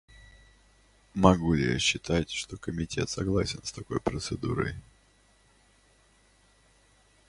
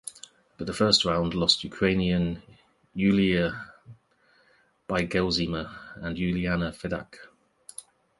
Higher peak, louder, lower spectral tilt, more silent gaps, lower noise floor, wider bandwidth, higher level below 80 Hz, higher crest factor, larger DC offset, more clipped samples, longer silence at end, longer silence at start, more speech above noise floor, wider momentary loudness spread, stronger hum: first, -2 dBFS vs -6 dBFS; second, -29 LUFS vs -26 LUFS; about the same, -5 dB/octave vs -5 dB/octave; neither; about the same, -63 dBFS vs -64 dBFS; about the same, 11.5 kHz vs 11.5 kHz; about the same, -46 dBFS vs -48 dBFS; first, 28 dB vs 22 dB; neither; neither; first, 2.5 s vs 0.4 s; first, 0.2 s vs 0.05 s; about the same, 35 dB vs 38 dB; second, 12 LU vs 19 LU; neither